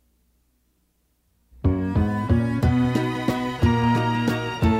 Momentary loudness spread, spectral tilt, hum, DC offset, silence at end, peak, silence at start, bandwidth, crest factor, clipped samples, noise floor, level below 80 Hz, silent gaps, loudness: 4 LU; -7.5 dB/octave; none; under 0.1%; 0 s; -8 dBFS; 1.65 s; 15.5 kHz; 16 dB; under 0.1%; -68 dBFS; -36 dBFS; none; -22 LUFS